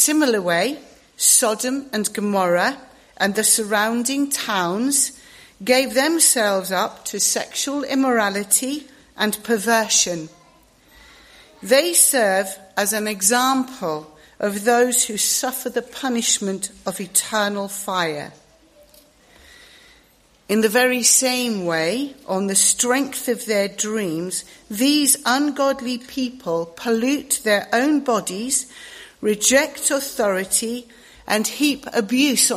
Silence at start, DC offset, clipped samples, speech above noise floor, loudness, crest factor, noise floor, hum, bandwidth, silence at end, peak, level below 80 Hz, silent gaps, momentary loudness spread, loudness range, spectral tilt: 0 s; under 0.1%; under 0.1%; 36 dB; -19 LUFS; 20 dB; -56 dBFS; none; 15.5 kHz; 0 s; 0 dBFS; -60 dBFS; none; 12 LU; 4 LU; -2 dB/octave